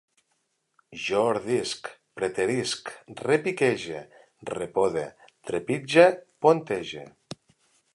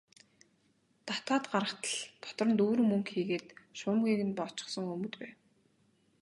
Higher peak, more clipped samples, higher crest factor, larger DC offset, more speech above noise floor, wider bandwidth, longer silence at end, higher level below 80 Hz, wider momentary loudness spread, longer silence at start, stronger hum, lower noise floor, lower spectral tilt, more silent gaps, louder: first, -4 dBFS vs -14 dBFS; neither; about the same, 22 dB vs 20 dB; neither; first, 49 dB vs 39 dB; about the same, 11.5 kHz vs 11.5 kHz; second, 0.6 s vs 0.9 s; first, -66 dBFS vs -80 dBFS; first, 20 LU vs 14 LU; second, 0.9 s vs 1.05 s; neither; about the same, -75 dBFS vs -72 dBFS; about the same, -4.5 dB/octave vs -4.5 dB/octave; neither; first, -25 LUFS vs -33 LUFS